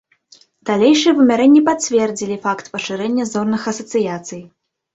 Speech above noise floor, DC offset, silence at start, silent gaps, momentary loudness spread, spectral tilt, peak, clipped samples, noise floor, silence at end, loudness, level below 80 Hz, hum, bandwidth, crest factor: 35 dB; under 0.1%; 0.65 s; none; 13 LU; -4.5 dB/octave; -2 dBFS; under 0.1%; -51 dBFS; 0.5 s; -16 LUFS; -60 dBFS; none; 8 kHz; 14 dB